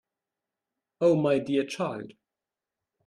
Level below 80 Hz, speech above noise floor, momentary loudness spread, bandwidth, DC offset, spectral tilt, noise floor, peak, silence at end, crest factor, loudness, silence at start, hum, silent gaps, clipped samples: -72 dBFS; 64 dB; 15 LU; 11.5 kHz; under 0.1%; -6.5 dB/octave; -89 dBFS; -12 dBFS; 0.95 s; 18 dB; -26 LUFS; 1 s; none; none; under 0.1%